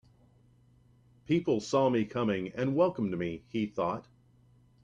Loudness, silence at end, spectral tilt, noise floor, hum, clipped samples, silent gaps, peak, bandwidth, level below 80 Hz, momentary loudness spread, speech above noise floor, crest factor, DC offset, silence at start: -31 LUFS; 0.85 s; -7 dB/octave; -63 dBFS; none; under 0.1%; none; -16 dBFS; 9.8 kHz; -66 dBFS; 8 LU; 33 dB; 18 dB; under 0.1%; 1.3 s